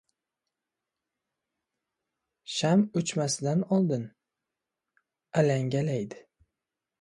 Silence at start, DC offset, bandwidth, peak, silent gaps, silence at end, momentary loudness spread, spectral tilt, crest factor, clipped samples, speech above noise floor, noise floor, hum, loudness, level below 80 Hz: 2.5 s; under 0.1%; 11.5 kHz; -10 dBFS; none; 0.8 s; 10 LU; -5.5 dB/octave; 20 dB; under 0.1%; 61 dB; -88 dBFS; none; -28 LUFS; -72 dBFS